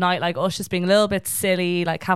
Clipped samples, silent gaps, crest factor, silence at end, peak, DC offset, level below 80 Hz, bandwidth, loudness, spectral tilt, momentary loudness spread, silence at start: under 0.1%; none; 16 dB; 0 s; -6 dBFS; 0.3%; -54 dBFS; 16.5 kHz; -21 LUFS; -4.5 dB/octave; 5 LU; 0 s